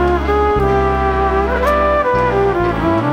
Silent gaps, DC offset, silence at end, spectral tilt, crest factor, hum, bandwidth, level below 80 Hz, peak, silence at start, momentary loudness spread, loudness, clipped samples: none; under 0.1%; 0 s; -7.5 dB/octave; 12 dB; none; 15 kHz; -24 dBFS; -2 dBFS; 0 s; 2 LU; -15 LUFS; under 0.1%